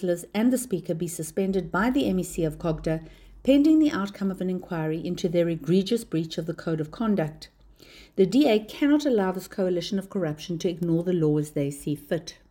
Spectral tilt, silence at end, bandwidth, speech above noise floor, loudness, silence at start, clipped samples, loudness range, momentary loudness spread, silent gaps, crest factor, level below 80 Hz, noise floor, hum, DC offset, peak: -6.5 dB/octave; 0.2 s; 17 kHz; 26 dB; -26 LUFS; 0 s; under 0.1%; 3 LU; 9 LU; none; 18 dB; -52 dBFS; -51 dBFS; none; under 0.1%; -8 dBFS